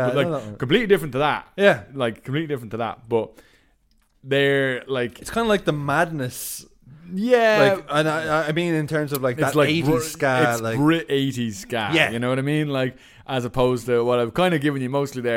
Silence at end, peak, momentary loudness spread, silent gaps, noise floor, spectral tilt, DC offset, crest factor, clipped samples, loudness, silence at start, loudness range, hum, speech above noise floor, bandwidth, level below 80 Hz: 0 s; -2 dBFS; 9 LU; none; -62 dBFS; -5.5 dB/octave; under 0.1%; 20 dB; under 0.1%; -21 LUFS; 0 s; 4 LU; none; 40 dB; 17 kHz; -50 dBFS